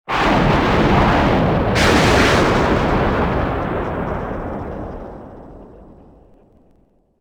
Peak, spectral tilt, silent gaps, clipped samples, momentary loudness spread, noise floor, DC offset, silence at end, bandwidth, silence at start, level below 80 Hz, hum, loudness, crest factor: -2 dBFS; -5.5 dB/octave; none; under 0.1%; 17 LU; -56 dBFS; under 0.1%; 1.35 s; over 20 kHz; 0.1 s; -28 dBFS; none; -16 LUFS; 16 dB